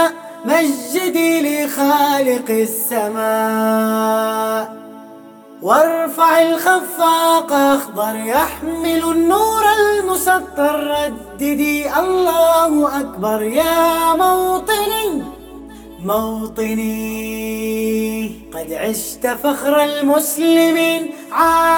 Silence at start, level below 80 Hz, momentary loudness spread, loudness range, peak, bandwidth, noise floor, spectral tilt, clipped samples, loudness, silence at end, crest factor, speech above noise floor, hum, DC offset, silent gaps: 0 s; -46 dBFS; 10 LU; 6 LU; -2 dBFS; over 20 kHz; -39 dBFS; -3.5 dB/octave; under 0.1%; -16 LUFS; 0 s; 14 dB; 23 dB; none; under 0.1%; none